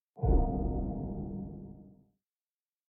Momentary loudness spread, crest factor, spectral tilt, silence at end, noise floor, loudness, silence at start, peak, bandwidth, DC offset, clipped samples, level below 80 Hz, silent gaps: 19 LU; 18 dB; -12 dB/octave; 0.95 s; under -90 dBFS; -34 LUFS; 0.15 s; -16 dBFS; 1.6 kHz; under 0.1%; under 0.1%; -36 dBFS; none